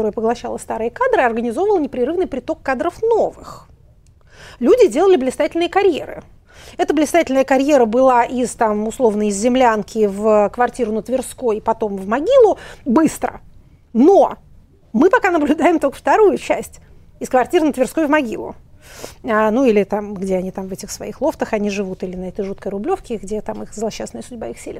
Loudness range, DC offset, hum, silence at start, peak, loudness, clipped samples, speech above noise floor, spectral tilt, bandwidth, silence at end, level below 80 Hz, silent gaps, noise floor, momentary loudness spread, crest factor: 5 LU; under 0.1%; none; 0 s; 0 dBFS; -17 LUFS; under 0.1%; 32 dB; -5 dB/octave; 15.5 kHz; 0 s; -44 dBFS; none; -48 dBFS; 14 LU; 16 dB